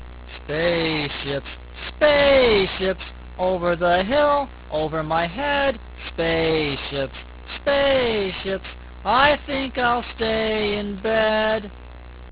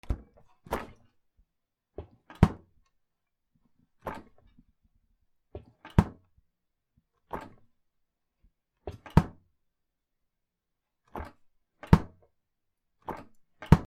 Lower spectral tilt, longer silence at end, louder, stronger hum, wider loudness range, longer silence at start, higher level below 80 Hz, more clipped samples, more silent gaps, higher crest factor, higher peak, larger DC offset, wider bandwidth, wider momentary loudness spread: about the same, -8.5 dB/octave vs -8.5 dB/octave; about the same, 0 s vs 0.05 s; first, -21 LUFS vs -30 LUFS; neither; about the same, 3 LU vs 3 LU; about the same, 0 s vs 0.1 s; about the same, -40 dBFS vs -42 dBFS; neither; neither; second, 20 dB vs 32 dB; about the same, -2 dBFS vs -2 dBFS; neither; second, 4 kHz vs 15 kHz; second, 17 LU vs 25 LU